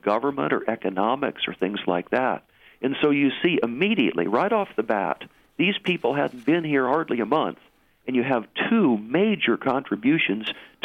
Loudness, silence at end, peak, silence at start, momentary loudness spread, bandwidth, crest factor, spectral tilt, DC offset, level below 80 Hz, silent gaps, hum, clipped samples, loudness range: -23 LUFS; 0.2 s; -6 dBFS; 0.05 s; 6 LU; 6 kHz; 18 dB; -7.5 dB/octave; under 0.1%; -68 dBFS; none; none; under 0.1%; 1 LU